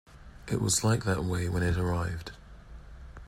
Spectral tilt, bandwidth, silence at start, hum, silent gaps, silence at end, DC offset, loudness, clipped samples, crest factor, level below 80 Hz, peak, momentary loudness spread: -4.5 dB/octave; 16 kHz; 0.1 s; none; none; 0 s; under 0.1%; -29 LUFS; under 0.1%; 16 dB; -46 dBFS; -14 dBFS; 23 LU